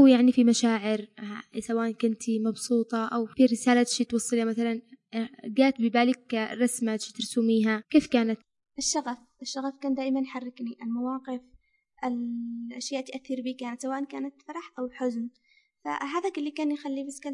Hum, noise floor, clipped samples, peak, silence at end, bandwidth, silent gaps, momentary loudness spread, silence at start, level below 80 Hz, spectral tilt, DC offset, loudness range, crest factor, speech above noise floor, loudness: none; -62 dBFS; under 0.1%; -8 dBFS; 0 s; 11.5 kHz; none; 14 LU; 0 s; -70 dBFS; -4 dB/octave; under 0.1%; 9 LU; 18 dB; 34 dB; -28 LUFS